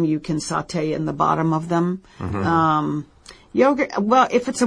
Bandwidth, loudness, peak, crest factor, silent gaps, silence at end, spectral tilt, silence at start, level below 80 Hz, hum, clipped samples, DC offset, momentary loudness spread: 10.5 kHz; -20 LUFS; -4 dBFS; 16 dB; none; 0 s; -6 dB/octave; 0 s; -52 dBFS; none; under 0.1%; under 0.1%; 10 LU